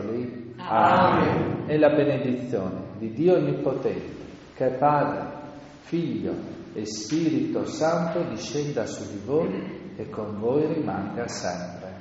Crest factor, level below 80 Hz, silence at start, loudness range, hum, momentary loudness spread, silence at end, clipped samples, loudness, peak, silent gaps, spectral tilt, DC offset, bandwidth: 18 dB; -58 dBFS; 0 s; 5 LU; none; 15 LU; 0 s; under 0.1%; -25 LUFS; -6 dBFS; none; -6 dB/octave; under 0.1%; 8 kHz